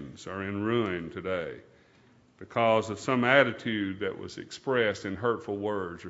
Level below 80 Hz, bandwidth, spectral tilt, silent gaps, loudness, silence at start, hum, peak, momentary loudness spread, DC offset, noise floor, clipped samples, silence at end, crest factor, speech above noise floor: -66 dBFS; 8 kHz; -5.5 dB/octave; none; -29 LUFS; 0 s; none; -6 dBFS; 15 LU; under 0.1%; -61 dBFS; under 0.1%; 0 s; 24 dB; 32 dB